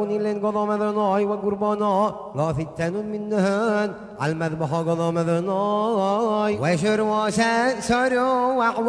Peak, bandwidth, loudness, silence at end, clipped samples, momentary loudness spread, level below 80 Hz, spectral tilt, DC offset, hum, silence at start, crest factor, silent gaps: -8 dBFS; 11 kHz; -22 LUFS; 0 s; under 0.1%; 6 LU; -54 dBFS; -6 dB/octave; under 0.1%; none; 0 s; 14 dB; none